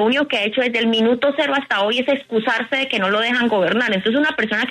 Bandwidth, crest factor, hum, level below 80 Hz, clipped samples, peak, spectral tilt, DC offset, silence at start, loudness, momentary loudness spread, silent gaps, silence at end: 11.5 kHz; 12 dB; none; -62 dBFS; under 0.1%; -6 dBFS; -5 dB/octave; under 0.1%; 0 s; -18 LUFS; 3 LU; none; 0 s